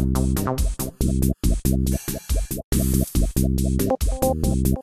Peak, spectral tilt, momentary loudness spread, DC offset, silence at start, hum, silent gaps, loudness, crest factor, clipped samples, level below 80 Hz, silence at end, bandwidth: -6 dBFS; -6 dB/octave; 5 LU; under 0.1%; 0 s; none; 2.64-2.72 s; -23 LUFS; 14 dB; under 0.1%; -24 dBFS; 0 s; 14.5 kHz